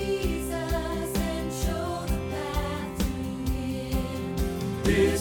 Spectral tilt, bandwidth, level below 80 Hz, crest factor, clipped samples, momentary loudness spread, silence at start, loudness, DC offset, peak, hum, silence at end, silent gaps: -5.5 dB/octave; 19 kHz; -34 dBFS; 18 dB; under 0.1%; 4 LU; 0 s; -29 LUFS; under 0.1%; -10 dBFS; none; 0 s; none